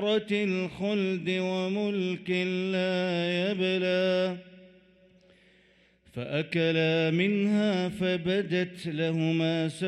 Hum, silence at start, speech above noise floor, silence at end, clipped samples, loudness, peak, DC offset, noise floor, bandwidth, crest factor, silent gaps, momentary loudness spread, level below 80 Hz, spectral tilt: none; 0 s; 35 dB; 0 s; under 0.1%; -28 LUFS; -12 dBFS; under 0.1%; -63 dBFS; 11.5 kHz; 16 dB; none; 6 LU; -66 dBFS; -6.5 dB/octave